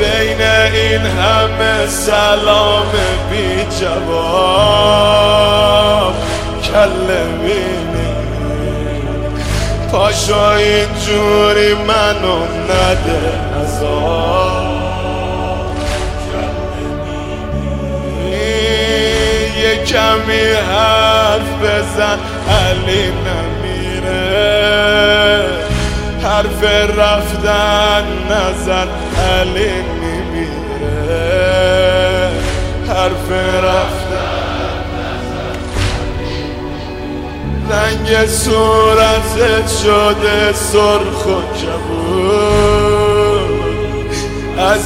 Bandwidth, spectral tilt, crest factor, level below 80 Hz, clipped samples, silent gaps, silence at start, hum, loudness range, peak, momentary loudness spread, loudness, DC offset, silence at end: 16.5 kHz; -4.5 dB/octave; 12 dB; -24 dBFS; under 0.1%; none; 0 s; none; 6 LU; 0 dBFS; 10 LU; -13 LUFS; under 0.1%; 0 s